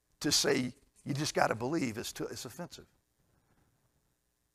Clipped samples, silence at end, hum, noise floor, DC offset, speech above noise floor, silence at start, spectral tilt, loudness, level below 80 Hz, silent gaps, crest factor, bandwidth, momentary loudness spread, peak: under 0.1%; 1.7 s; none; -78 dBFS; under 0.1%; 45 dB; 0.2 s; -3.5 dB/octave; -33 LUFS; -66 dBFS; none; 28 dB; 15.5 kHz; 19 LU; -10 dBFS